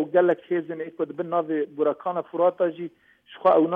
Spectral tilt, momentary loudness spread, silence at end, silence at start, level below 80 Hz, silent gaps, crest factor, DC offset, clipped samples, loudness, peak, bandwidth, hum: -9 dB/octave; 10 LU; 0 s; 0 s; -74 dBFS; none; 16 dB; under 0.1%; under 0.1%; -25 LUFS; -8 dBFS; 4.1 kHz; none